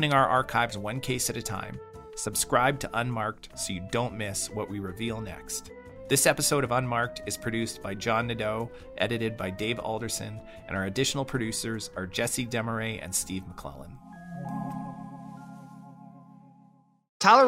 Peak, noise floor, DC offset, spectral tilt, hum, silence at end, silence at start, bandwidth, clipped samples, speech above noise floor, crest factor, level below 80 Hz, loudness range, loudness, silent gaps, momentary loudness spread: -6 dBFS; -60 dBFS; under 0.1%; -3.5 dB/octave; none; 0 s; 0 s; 16 kHz; under 0.1%; 31 dB; 24 dB; -52 dBFS; 8 LU; -29 LUFS; 17.09-17.20 s; 19 LU